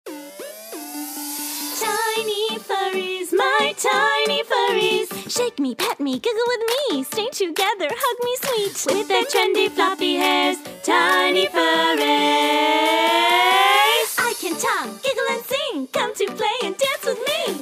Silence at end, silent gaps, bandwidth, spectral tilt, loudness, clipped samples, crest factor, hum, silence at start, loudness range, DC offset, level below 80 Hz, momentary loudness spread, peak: 0 s; none; 16 kHz; -1.5 dB/octave; -19 LUFS; under 0.1%; 18 dB; none; 0.05 s; 6 LU; under 0.1%; -72 dBFS; 9 LU; -2 dBFS